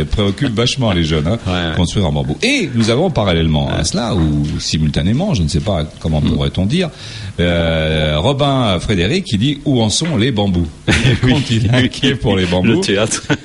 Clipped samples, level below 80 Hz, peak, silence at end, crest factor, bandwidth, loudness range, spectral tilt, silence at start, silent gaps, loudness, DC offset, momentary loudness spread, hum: under 0.1%; -28 dBFS; -2 dBFS; 0 s; 12 dB; 11.5 kHz; 2 LU; -5.5 dB/octave; 0 s; none; -15 LUFS; under 0.1%; 4 LU; none